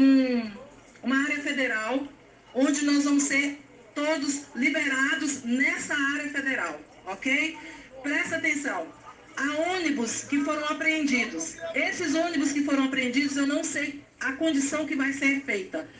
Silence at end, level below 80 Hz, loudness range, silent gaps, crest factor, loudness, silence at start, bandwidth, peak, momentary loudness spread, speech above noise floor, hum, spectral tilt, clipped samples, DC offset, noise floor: 0 s; -66 dBFS; 3 LU; none; 16 dB; -26 LUFS; 0 s; 9.8 kHz; -12 dBFS; 10 LU; 20 dB; none; -2.5 dB/octave; under 0.1%; under 0.1%; -47 dBFS